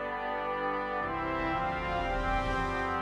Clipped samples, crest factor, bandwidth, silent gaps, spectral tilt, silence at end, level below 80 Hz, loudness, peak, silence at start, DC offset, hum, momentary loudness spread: under 0.1%; 14 dB; 11.5 kHz; none; -6 dB/octave; 0 s; -42 dBFS; -32 LUFS; -18 dBFS; 0 s; under 0.1%; 50 Hz at -65 dBFS; 2 LU